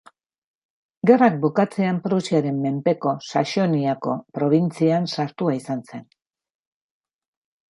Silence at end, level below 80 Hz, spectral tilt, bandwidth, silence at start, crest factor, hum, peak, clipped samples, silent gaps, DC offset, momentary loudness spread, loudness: 1.65 s; -70 dBFS; -7 dB/octave; 11.5 kHz; 1.05 s; 20 dB; none; -2 dBFS; under 0.1%; none; under 0.1%; 10 LU; -21 LUFS